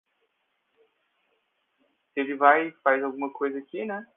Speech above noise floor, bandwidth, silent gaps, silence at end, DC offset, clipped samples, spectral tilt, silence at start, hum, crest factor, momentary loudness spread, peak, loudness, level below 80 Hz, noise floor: 50 dB; 3.8 kHz; none; 0.15 s; under 0.1%; under 0.1%; -8 dB/octave; 2.15 s; none; 26 dB; 13 LU; -4 dBFS; -25 LUFS; -88 dBFS; -75 dBFS